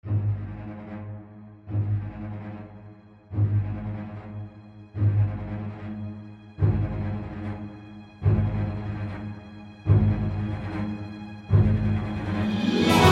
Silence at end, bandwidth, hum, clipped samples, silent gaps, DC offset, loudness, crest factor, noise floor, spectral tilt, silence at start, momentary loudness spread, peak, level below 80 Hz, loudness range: 0 s; 13.5 kHz; none; under 0.1%; none; under 0.1%; -27 LUFS; 24 dB; -48 dBFS; -7 dB/octave; 0.05 s; 19 LU; -2 dBFS; -40 dBFS; 6 LU